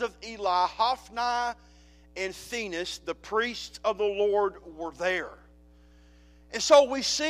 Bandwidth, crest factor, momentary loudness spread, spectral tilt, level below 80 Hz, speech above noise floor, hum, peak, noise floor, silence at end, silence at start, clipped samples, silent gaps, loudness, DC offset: 15.5 kHz; 24 dB; 17 LU; -2 dB/octave; -56 dBFS; 28 dB; none; -6 dBFS; -55 dBFS; 0 s; 0 s; under 0.1%; none; -27 LUFS; under 0.1%